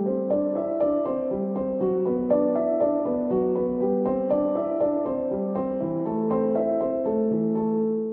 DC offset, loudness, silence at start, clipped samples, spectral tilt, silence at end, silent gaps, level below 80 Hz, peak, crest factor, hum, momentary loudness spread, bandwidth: under 0.1%; -25 LUFS; 0 s; under 0.1%; -12.5 dB/octave; 0 s; none; -56 dBFS; -10 dBFS; 14 dB; none; 4 LU; 3.3 kHz